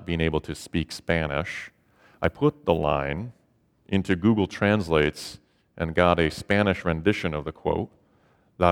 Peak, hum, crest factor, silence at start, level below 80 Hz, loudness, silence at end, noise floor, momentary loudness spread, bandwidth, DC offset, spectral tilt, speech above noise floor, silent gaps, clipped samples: -4 dBFS; none; 22 dB; 0 s; -44 dBFS; -25 LUFS; 0 s; -64 dBFS; 12 LU; 16 kHz; under 0.1%; -6.5 dB/octave; 40 dB; none; under 0.1%